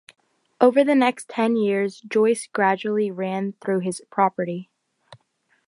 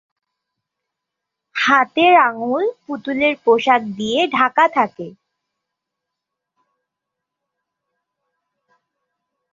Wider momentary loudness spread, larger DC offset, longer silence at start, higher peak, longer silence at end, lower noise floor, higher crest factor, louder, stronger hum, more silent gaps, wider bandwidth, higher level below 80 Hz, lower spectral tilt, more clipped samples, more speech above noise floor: second, 10 LU vs 13 LU; neither; second, 0.6 s vs 1.55 s; about the same, -2 dBFS vs -2 dBFS; second, 0.5 s vs 4.4 s; second, -67 dBFS vs -82 dBFS; about the same, 20 dB vs 18 dB; second, -22 LUFS vs -16 LUFS; neither; neither; first, 11.5 kHz vs 7.6 kHz; second, -76 dBFS vs -66 dBFS; first, -5.5 dB/octave vs -4 dB/octave; neither; second, 46 dB vs 65 dB